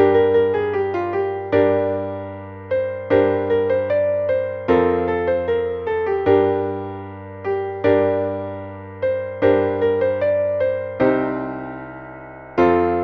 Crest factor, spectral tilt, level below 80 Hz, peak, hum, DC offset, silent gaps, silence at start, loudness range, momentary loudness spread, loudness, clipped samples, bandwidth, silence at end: 16 dB; -9 dB/octave; -50 dBFS; -2 dBFS; none; under 0.1%; none; 0 s; 2 LU; 14 LU; -20 LUFS; under 0.1%; 5.2 kHz; 0 s